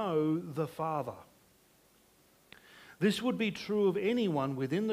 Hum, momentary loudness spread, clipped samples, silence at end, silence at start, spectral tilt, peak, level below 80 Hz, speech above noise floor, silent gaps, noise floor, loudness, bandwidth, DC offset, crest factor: none; 8 LU; under 0.1%; 0 s; 0 s; -6.5 dB/octave; -18 dBFS; -72 dBFS; 34 dB; none; -66 dBFS; -33 LUFS; 15.5 kHz; under 0.1%; 16 dB